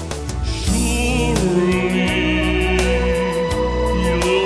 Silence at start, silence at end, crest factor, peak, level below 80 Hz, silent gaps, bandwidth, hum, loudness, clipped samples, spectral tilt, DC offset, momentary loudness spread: 0 s; 0 s; 14 dB; -4 dBFS; -24 dBFS; none; 11 kHz; none; -18 LUFS; under 0.1%; -5 dB/octave; under 0.1%; 3 LU